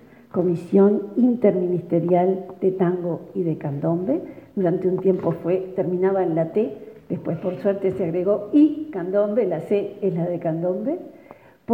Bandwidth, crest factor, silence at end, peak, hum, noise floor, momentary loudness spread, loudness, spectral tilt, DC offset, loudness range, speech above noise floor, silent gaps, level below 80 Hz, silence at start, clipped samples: 4.5 kHz; 16 dB; 0 s; -4 dBFS; none; -47 dBFS; 10 LU; -22 LUFS; -10.5 dB/octave; under 0.1%; 3 LU; 26 dB; none; -64 dBFS; 0.35 s; under 0.1%